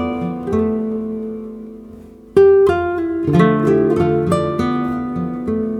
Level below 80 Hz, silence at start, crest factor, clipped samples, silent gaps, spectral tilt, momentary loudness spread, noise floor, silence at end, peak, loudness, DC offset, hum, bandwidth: -44 dBFS; 0 s; 16 dB; under 0.1%; none; -8.5 dB/octave; 15 LU; -38 dBFS; 0 s; -2 dBFS; -16 LUFS; under 0.1%; none; 11 kHz